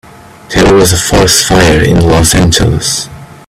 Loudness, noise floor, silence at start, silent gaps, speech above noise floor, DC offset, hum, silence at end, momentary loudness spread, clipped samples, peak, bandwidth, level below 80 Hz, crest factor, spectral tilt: -7 LUFS; -30 dBFS; 0.5 s; none; 23 dB; under 0.1%; none; 0.15 s; 8 LU; 0.3%; 0 dBFS; over 20 kHz; -22 dBFS; 8 dB; -4 dB/octave